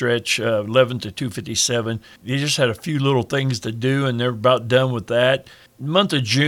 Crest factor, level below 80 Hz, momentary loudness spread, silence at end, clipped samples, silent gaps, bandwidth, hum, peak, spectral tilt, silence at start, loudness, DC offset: 16 dB; -58 dBFS; 8 LU; 0 s; under 0.1%; none; 16 kHz; none; -2 dBFS; -4.5 dB/octave; 0 s; -20 LUFS; under 0.1%